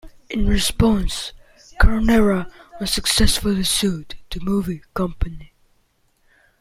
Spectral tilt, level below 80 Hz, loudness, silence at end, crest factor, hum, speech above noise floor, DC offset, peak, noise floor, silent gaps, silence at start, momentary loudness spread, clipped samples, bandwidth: -4 dB/octave; -26 dBFS; -20 LUFS; 1.15 s; 18 dB; none; 44 dB; under 0.1%; -2 dBFS; -62 dBFS; none; 0.05 s; 13 LU; under 0.1%; 16 kHz